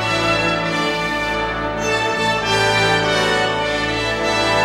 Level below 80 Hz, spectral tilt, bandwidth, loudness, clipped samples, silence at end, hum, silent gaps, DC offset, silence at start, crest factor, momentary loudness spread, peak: -38 dBFS; -3.5 dB/octave; 16.5 kHz; -17 LUFS; under 0.1%; 0 s; none; none; under 0.1%; 0 s; 14 dB; 5 LU; -4 dBFS